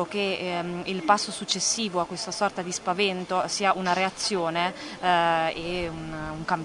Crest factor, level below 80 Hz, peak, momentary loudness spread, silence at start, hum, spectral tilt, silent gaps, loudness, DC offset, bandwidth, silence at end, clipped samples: 20 dB; -54 dBFS; -6 dBFS; 7 LU; 0 s; none; -3 dB/octave; none; -26 LUFS; under 0.1%; 11 kHz; 0 s; under 0.1%